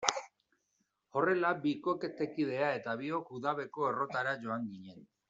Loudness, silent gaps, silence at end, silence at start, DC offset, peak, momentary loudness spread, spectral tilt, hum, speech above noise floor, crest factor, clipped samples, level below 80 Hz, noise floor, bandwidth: -35 LUFS; none; 0.25 s; 0 s; under 0.1%; -4 dBFS; 9 LU; -3 dB/octave; none; 46 dB; 30 dB; under 0.1%; -80 dBFS; -80 dBFS; 7.8 kHz